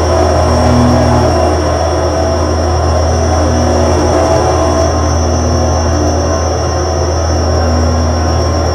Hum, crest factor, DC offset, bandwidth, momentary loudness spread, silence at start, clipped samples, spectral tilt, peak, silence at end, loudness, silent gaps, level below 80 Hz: none; 10 dB; under 0.1%; 11.5 kHz; 3 LU; 0 s; under 0.1%; -6 dB/octave; 0 dBFS; 0 s; -11 LUFS; none; -18 dBFS